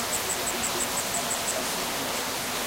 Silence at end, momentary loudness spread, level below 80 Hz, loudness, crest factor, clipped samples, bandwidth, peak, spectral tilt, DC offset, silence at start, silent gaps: 0 s; 2 LU; -54 dBFS; -27 LUFS; 16 dB; under 0.1%; 16 kHz; -14 dBFS; -1 dB/octave; under 0.1%; 0 s; none